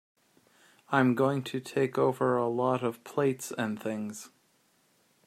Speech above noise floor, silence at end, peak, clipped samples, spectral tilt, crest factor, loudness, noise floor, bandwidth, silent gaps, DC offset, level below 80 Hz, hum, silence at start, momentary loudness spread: 40 dB; 1 s; -8 dBFS; under 0.1%; -6 dB/octave; 22 dB; -29 LUFS; -69 dBFS; 15 kHz; none; under 0.1%; -76 dBFS; none; 0.9 s; 10 LU